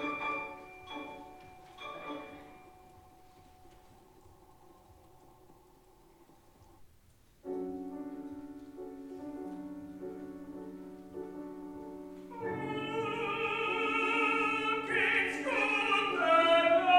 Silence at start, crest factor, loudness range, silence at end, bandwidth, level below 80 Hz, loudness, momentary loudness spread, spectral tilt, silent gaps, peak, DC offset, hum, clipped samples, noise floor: 0 s; 22 dB; 20 LU; 0 s; 16 kHz; -68 dBFS; -32 LUFS; 20 LU; -4 dB/octave; none; -14 dBFS; under 0.1%; none; under 0.1%; -63 dBFS